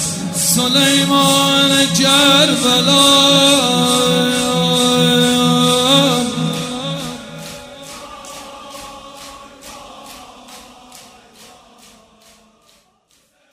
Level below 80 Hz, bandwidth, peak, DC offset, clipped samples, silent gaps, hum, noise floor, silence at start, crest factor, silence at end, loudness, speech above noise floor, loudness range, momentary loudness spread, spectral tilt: -52 dBFS; 16 kHz; 0 dBFS; under 0.1%; under 0.1%; none; none; -58 dBFS; 0 s; 16 dB; 2.5 s; -12 LUFS; 46 dB; 23 LU; 23 LU; -3 dB/octave